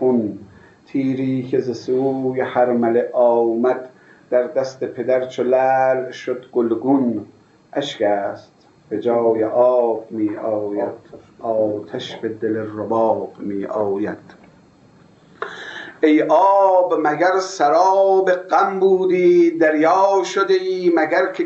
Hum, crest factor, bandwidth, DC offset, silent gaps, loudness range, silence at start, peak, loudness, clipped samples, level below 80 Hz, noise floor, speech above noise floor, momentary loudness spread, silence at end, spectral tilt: none; 16 dB; 7.8 kHz; under 0.1%; none; 8 LU; 0 s; -2 dBFS; -18 LUFS; under 0.1%; -68 dBFS; -50 dBFS; 32 dB; 13 LU; 0 s; -6 dB/octave